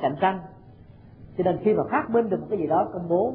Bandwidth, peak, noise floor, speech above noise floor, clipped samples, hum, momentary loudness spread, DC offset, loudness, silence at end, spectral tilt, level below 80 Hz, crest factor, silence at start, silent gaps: 4.3 kHz; -8 dBFS; -48 dBFS; 24 dB; under 0.1%; none; 5 LU; under 0.1%; -24 LUFS; 0 s; -11.5 dB/octave; -56 dBFS; 18 dB; 0 s; none